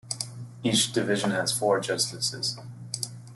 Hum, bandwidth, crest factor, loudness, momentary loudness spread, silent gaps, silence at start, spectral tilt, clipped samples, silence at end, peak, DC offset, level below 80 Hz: none; 12.5 kHz; 18 dB; -27 LUFS; 10 LU; none; 0.05 s; -3 dB/octave; under 0.1%; 0 s; -10 dBFS; under 0.1%; -66 dBFS